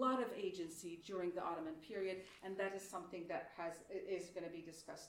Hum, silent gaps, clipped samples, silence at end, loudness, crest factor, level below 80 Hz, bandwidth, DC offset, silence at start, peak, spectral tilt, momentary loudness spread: none; none; under 0.1%; 0 s; -46 LUFS; 20 dB; -80 dBFS; 16 kHz; under 0.1%; 0 s; -26 dBFS; -4.5 dB/octave; 7 LU